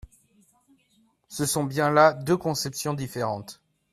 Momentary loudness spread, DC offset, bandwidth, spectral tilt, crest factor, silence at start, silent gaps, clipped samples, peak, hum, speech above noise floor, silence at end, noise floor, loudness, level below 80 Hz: 14 LU; under 0.1%; 15 kHz; -4.5 dB/octave; 22 dB; 1.3 s; none; under 0.1%; -4 dBFS; none; 41 dB; 0.4 s; -66 dBFS; -24 LUFS; -58 dBFS